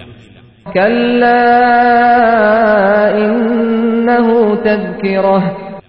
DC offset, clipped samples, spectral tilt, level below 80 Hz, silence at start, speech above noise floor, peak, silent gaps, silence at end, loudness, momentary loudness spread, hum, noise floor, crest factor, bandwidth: 0.5%; under 0.1%; -10 dB/octave; -46 dBFS; 0 s; 31 dB; 0 dBFS; none; 0.1 s; -11 LUFS; 6 LU; none; -40 dBFS; 10 dB; 5.6 kHz